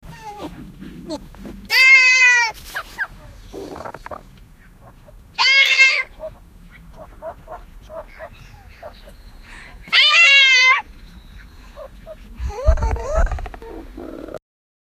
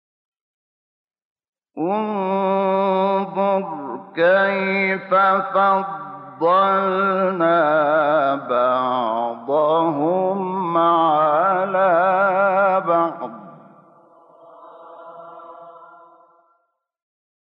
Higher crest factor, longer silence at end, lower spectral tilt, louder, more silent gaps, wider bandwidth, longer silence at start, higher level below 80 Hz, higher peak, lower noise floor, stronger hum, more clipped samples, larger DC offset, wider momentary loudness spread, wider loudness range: first, 20 dB vs 14 dB; second, 0.6 s vs 1.65 s; second, -1.5 dB/octave vs -9.5 dB/octave; first, -12 LUFS vs -18 LUFS; neither; first, 15.5 kHz vs 5.4 kHz; second, 0.05 s vs 1.75 s; first, -30 dBFS vs -78 dBFS; first, 0 dBFS vs -6 dBFS; second, -45 dBFS vs -70 dBFS; neither; neither; neither; first, 28 LU vs 13 LU; first, 12 LU vs 5 LU